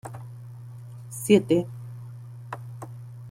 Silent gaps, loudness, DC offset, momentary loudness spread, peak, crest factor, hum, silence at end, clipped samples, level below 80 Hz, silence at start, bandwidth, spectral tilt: none; -24 LUFS; under 0.1%; 22 LU; -4 dBFS; 24 dB; none; 0 s; under 0.1%; -64 dBFS; 0.05 s; 16.5 kHz; -6 dB/octave